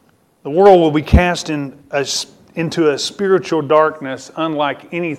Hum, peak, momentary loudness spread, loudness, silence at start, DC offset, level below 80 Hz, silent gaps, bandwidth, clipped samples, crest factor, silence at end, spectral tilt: none; 0 dBFS; 13 LU; -15 LUFS; 0.45 s; under 0.1%; -28 dBFS; none; 14 kHz; under 0.1%; 16 dB; 0 s; -5.5 dB/octave